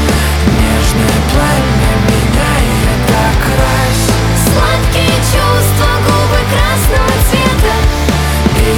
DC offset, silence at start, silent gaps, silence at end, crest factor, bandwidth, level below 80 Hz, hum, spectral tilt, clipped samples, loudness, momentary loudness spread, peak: under 0.1%; 0 s; none; 0 s; 10 dB; 18 kHz; -14 dBFS; none; -5 dB/octave; under 0.1%; -11 LUFS; 1 LU; 0 dBFS